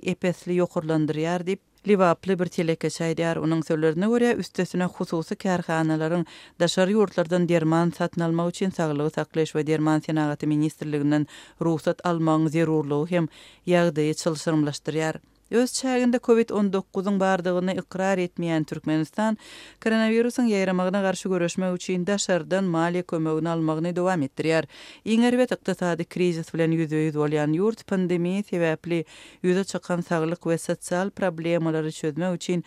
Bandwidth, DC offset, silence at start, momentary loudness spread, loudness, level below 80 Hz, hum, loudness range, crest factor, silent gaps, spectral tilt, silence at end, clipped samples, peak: 14.5 kHz; under 0.1%; 0 s; 6 LU; -24 LUFS; -66 dBFS; none; 2 LU; 16 dB; none; -6 dB/octave; 0.05 s; under 0.1%; -8 dBFS